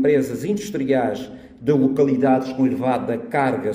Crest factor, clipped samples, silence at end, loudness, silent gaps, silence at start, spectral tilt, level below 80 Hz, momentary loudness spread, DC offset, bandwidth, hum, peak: 14 dB; under 0.1%; 0 s; -20 LUFS; none; 0 s; -7 dB/octave; -56 dBFS; 7 LU; under 0.1%; 15.5 kHz; none; -4 dBFS